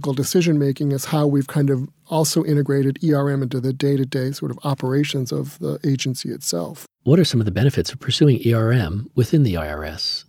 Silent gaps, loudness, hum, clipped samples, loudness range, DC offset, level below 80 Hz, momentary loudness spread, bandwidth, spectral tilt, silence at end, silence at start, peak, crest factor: none; -20 LUFS; none; under 0.1%; 4 LU; under 0.1%; -46 dBFS; 8 LU; 16.5 kHz; -6 dB/octave; 0.05 s; 0 s; -2 dBFS; 18 dB